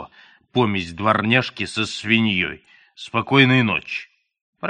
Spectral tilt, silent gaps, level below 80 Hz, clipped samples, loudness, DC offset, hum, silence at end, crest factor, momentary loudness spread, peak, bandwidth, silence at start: -5.5 dB/octave; 4.41-4.53 s; -56 dBFS; under 0.1%; -19 LUFS; under 0.1%; none; 0 s; 20 dB; 13 LU; 0 dBFS; 10 kHz; 0 s